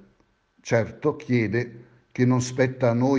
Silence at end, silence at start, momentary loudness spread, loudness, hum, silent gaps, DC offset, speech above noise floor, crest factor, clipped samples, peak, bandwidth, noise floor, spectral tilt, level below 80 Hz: 0 s; 0.65 s; 12 LU; -24 LUFS; none; none; under 0.1%; 42 dB; 18 dB; under 0.1%; -6 dBFS; 9.4 kHz; -64 dBFS; -7 dB/octave; -60 dBFS